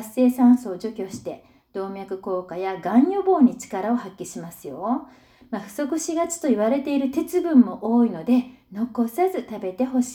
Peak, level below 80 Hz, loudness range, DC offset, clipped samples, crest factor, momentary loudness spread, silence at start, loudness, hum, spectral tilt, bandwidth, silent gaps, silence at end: -4 dBFS; -64 dBFS; 4 LU; under 0.1%; under 0.1%; 18 dB; 16 LU; 0 s; -22 LUFS; none; -5.5 dB/octave; 16 kHz; none; 0 s